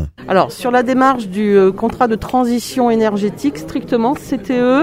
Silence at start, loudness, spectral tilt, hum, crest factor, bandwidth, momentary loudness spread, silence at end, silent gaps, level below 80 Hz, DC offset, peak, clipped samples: 0 s; -15 LUFS; -6 dB/octave; none; 14 dB; 16 kHz; 7 LU; 0 s; none; -40 dBFS; under 0.1%; 0 dBFS; under 0.1%